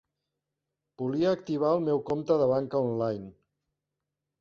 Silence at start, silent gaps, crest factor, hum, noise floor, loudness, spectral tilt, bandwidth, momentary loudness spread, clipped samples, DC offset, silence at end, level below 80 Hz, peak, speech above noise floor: 1 s; none; 18 dB; none; -86 dBFS; -28 LUFS; -8.5 dB/octave; 7 kHz; 9 LU; under 0.1%; under 0.1%; 1.1 s; -68 dBFS; -12 dBFS; 59 dB